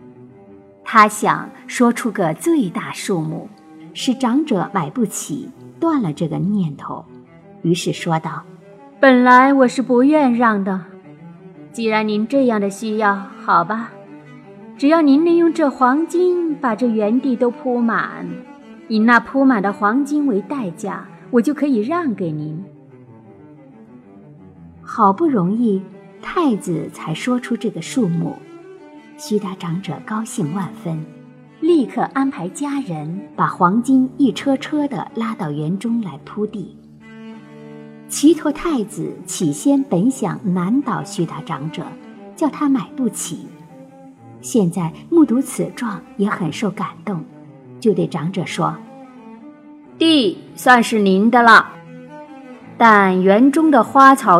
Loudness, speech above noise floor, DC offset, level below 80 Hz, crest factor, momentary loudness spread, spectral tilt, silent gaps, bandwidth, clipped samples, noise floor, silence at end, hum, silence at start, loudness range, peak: -17 LUFS; 27 dB; under 0.1%; -60 dBFS; 18 dB; 17 LU; -5.5 dB/octave; none; 14 kHz; under 0.1%; -43 dBFS; 0 s; none; 0.05 s; 9 LU; 0 dBFS